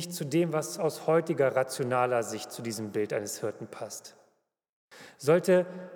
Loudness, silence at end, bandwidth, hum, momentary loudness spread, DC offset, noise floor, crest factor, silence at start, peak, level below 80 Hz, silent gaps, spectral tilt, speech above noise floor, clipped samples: -29 LUFS; 0 s; 19 kHz; none; 12 LU; under 0.1%; -72 dBFS; 18 dB; 0 s; -12 dBFS; -88 dBFS; 4.69-4.88 s; -5 dB/octave; 43 dB; under 0.1%